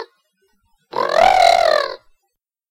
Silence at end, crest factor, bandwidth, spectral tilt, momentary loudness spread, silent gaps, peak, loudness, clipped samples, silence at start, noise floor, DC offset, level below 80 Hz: 0.75 s; 14 dB; 16.5 kHz; -1.5 dB/octave; 14 LU; none; -4 dBFS; -14 LUFS; under 0.1%; 0 s; -75 dBFS; under 0.1%; -48 dBFS